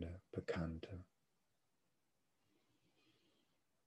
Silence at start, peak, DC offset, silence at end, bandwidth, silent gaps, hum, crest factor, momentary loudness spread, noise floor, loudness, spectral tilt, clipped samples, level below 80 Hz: 0 s; -30 dBFS; under 0.1%; 2.8 s; 11 kHz; none; none; 22 dB; 11 LU; -87 dBFS; -48 LUFS; -7.5 dB/octave; under 0.1%; -66 dBFS